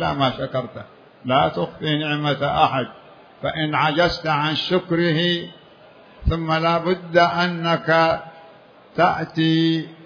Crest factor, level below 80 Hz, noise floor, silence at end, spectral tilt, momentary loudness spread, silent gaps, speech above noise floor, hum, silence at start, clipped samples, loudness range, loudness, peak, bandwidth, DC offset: 18 dB; -40 dBFS; -47 dBFS; 0 s; -6.5 dB/octave; 10 LU; none; 27 dB; none; 0 s; under 0.1%; 2 LU; -20 LUFS; -2 dBFS; 5.4 kHz; under 0.1%